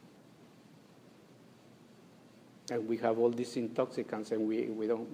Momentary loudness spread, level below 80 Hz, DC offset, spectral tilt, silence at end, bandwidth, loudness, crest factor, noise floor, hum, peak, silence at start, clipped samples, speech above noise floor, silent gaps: 8 LU; -82 dBFS; under 0.1%; -6 dB/octave; 0 s; 15.5 kHz; -34 LUFS; 20 dB; -59 dBFS; none; -18 dBFS; 0.05 s; under 0.1%; 25 dB; none